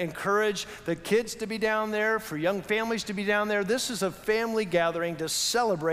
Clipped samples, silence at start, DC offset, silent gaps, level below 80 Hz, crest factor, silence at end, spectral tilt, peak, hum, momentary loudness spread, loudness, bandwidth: under 0.1%; 0 s; under 0.1%; none; -60 dBFS; 16 dB; 0 s; -3.5 dB/octave; -12 dBFS; none; 5 LU; -27 LUFS; 16 kHz